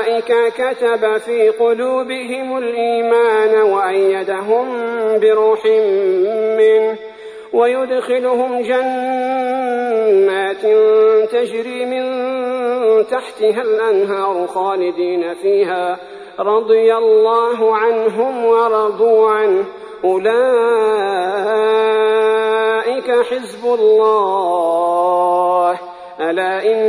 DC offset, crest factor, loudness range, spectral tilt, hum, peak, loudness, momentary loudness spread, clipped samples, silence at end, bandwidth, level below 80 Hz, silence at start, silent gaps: under 0.1%; 12 dB; 2 LU; -4.5 dB/octave; none; -2 dBFS; -15 LUFS; 8 LU; under 0.1%; 0 s; 10.5 kHz; -66 dBFS; 0 s; none